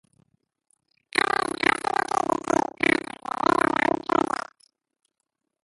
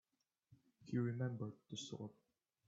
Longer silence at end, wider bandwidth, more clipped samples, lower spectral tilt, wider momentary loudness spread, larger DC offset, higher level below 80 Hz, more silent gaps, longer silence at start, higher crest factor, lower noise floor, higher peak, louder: first, 1.4 s vs 0.55 s; first, 11.5 kHz vs 7.8 kHz; neither; second, -3.5 dB/octave vs -6.5 dB/octave; second, 6 LU vs 12 LU; neither; first, -60 dBFS vs -82 dBFS; neither; first, 1.15 s vs 0.5 s; about the same, 22 dB vs 18 dB; first, -81 dBFS vs -77 dBFS; first, -4 dBFS vs -30 dBFS; first, -24 LUFS vs -46 LUFS